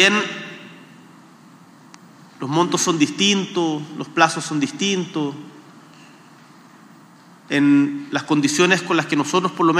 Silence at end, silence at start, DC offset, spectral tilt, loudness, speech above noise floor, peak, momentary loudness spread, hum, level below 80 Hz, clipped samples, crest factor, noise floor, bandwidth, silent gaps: 0 s; 0 s; under 0.1%; -3.5 dB/octave; -19 LUFS; 28 dB; 0 dBFS; 12 LU; none; -80 dBFS; under 0.1%; 20 dB; -47 dBFS; 13.5 kHz; none